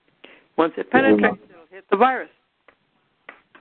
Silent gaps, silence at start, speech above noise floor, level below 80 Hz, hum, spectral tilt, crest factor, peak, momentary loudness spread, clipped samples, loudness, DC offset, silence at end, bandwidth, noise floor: none; 0.6 s; 48 dB; -60 dBFS; none; -10.5 dB/octave; 20 dB; -2 dBFS; 15 LU; under 0.1%; -20 LUFS; under 0.1%; 1.35 s; 4.4 kHz; -67 dBFS